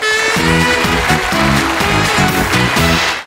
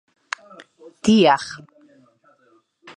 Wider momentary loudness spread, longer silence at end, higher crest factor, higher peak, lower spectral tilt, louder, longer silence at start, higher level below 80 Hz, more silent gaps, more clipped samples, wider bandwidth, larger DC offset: second, 1 LU vs 19 LU; second, 0 s vs 1.4 s; second, 12 dB vs 20 dB; about the same, 0 dBFS vs -2 dBFS; about the same, -4 dB/octave vs -5 dB/octave; first, -12 LUFS vs -17 LUFS; second, 0 s vs 1.05 s; first, -28 dBFS vs -58 dBFS; neither; neither; first, 16.5 kHz vs 10.5 kHz; neither